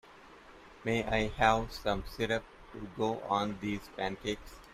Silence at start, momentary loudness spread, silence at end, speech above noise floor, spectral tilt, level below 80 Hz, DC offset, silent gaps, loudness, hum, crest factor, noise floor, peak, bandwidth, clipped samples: 0.05 s; 14 LU; 0 s; 22 dB; -5 dB/octave; -50 dBFS; under 0.1%; none; -33 LUFS; none; 22 dB; -55 dBFS; -12 dBFS; 15.5 kHz; under 0.1%